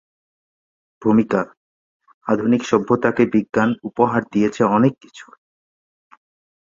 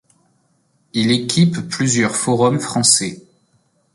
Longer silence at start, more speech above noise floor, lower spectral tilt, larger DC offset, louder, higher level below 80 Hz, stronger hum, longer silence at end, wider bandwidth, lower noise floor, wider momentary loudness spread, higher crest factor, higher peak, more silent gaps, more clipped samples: about the same, 1 s vs 0.95 s; first, over 72 dB vs 45 dB; first, -7 dB/octave vs -4 dB/octave; neither; about the same, -18 LUFS vs -16 LUFS; about the same, -58 dBFS vs -56 dBFS; neither; first, 1.45 s vs 0.75 s; second, 7.6 kHz vs 11.5 kHz; first, under -90 dBFS vs -62 dBFS; about the same, 7 LU vs 7 LU; about the same, 18 dB vs 18 dB; about the same, -2 dBFS vs 0 dBFS; first, 1.57-2.00 s, 2.14-2.21 s vs none; neither